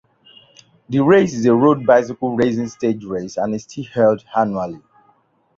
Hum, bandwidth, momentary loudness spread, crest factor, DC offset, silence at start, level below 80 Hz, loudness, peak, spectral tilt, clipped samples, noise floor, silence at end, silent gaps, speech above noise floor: none; 7.6 kHz; 12 LU; 16 dB; under 0.1%; 0.9 s; -56 dBFS; -17 LUFS; -2 dBFS; -7 dB/octave; under 0.1%; -59 dBFS; 0.8 s; none; 42 dB